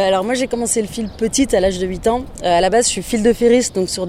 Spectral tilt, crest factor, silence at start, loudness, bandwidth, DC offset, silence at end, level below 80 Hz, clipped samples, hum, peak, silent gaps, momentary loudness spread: -3.5 dB/octave; 14 dB; 0 s; -16 LUFS; 16 kHz; under 0.1%; 0 s; -36 dBFS; under 0.1%; none; -2 dBFS; none; 6 LU